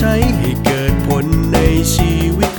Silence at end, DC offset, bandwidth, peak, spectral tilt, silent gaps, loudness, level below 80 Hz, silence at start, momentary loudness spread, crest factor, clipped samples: 0 s; under 0.1%; 19.5 kHz; 0 dBFS; -5.5 dB/octave; none; -14 LUFS; -20 dBFS; 0 s; 3 LU; 14 dB; under 0.1%